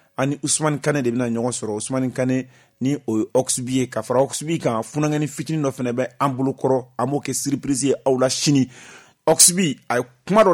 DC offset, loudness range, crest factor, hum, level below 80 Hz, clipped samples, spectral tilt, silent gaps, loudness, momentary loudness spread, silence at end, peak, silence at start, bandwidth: under 0.1%; 4 LU; 20 dB; none; -60 dBFS; under 0.1%; -4 dB/octave; none; -21 LUFS; 7 LU; 0 s; 0 dBFS; 0.2 s; 19 kHz